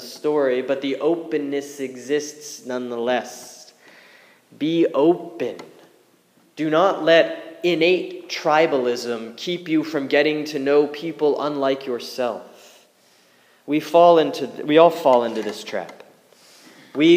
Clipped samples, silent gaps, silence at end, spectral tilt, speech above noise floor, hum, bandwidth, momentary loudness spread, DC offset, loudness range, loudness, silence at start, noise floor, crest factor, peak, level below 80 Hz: under 0.1%; none; 0 s; -5 dB/octave; 38 dB; none; 15.5 kHz; 15 LU; under 0.1%; 7 LU; -20 LUFS; 0 s; -58 dBFS; 20 dB; 0 dBFS; -82 dBFS